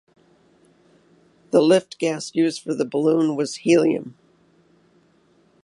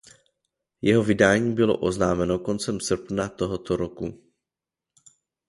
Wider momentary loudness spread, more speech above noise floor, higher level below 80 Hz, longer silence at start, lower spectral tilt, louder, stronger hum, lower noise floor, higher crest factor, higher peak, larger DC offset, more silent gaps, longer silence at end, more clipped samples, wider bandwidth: about the same, 9 LU vs 10 LU; second, 39 dB vs 65 dB; second, -70 dBFS vs -50 dBFS; first, 1.55 s vs 0.85 s; about the same, -5.5 dB/octave vs -5.5 dB/octave; first, -20 LUFS vs -24 LUFS; neither; second, -59 dBFS vs -88 dBFS; about the same, 20 dB vs 20 dB; about the same, -4 dBFS vs -4 dBFS; neither; neither; first, 1.55 s vs 1.35 s; neither; about the same, 11.5 kHz vs 11.5 kHz